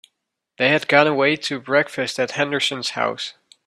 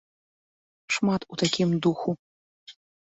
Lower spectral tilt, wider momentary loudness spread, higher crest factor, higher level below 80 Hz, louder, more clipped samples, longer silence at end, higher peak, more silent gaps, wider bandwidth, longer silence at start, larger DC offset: about the same, -4 dB/octave vs -5 dB/octave; about the same, 9 LU vs 8 LU; about the same, 20 dB vs 20 dB; about the same, -66 dBFS vs -64 dBFS; first, -19 LUFS vs -26 LUFS; neither; about the same, 0.35 s vs 0.35 s; first, -2 dBFS vs -10 dBFS; second, none vs 2.19-2.67 s; first, 13 kHz vs 8.2 kHz; second, 0.6 s vs 0.9 s; neither